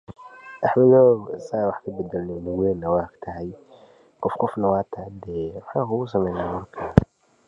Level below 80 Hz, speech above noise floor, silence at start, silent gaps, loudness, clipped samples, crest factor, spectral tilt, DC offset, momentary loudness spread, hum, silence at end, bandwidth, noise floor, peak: -42 dBFS; 29 dB; 0.1 s; none; -23 LUFS; under 0.1%; 22 dB; -9.5 dB/octave; under 0.1%; 18 LU; none; 0.45 s; 7.4 kHz; -51 dBFS; 0 dBFS